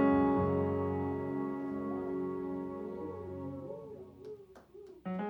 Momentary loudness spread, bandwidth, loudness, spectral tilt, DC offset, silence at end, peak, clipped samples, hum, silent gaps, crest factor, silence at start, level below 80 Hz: 20 LU; 4.6 kHz; -36 LUFS; -10 dB/octave; under 0.1%; 0 s; -18 dBFS; under 0.1%; none; none; 18 dB; 0 s; -62 dBFS